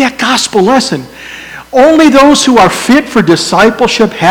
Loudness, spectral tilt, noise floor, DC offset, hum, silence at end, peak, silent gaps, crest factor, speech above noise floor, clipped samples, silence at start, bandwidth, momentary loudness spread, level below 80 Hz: -7 LUFS; -4 dB/octave; -26 dBFS; under 0.1%; none; 0 s; 0 dBFS; none; 8 dB; 20 dB; 5%; 0 s; 19.5 kHz; 15 LU; -38 dBFS